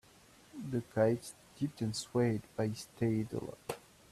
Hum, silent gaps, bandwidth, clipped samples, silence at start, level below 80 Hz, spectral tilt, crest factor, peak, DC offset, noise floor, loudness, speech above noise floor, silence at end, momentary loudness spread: none; none; 14.5 kHz; under 0.1%; 0.55 s; -68 dBFS; -6.5 dB/octave; 20 dB; -16 dBFS; under 0.1%; -62 dBFS; -36 LUFS; 27 dB; 0.35 s; 15 LU